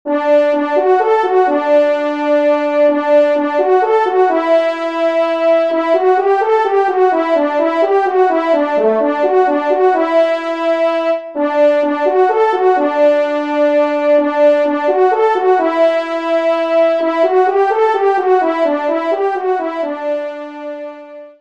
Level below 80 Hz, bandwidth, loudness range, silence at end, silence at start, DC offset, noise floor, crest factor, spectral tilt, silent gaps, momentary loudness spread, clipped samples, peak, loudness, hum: -68 dBFS; 8 kHz; 1 LU; 0.1 s; 0.05 s; 0.3%; -33 dBFS; 12 dB; -4.5 dB/octave; none; 5 LU; under 0.1%; 0 dBFS; -13 LUFS; none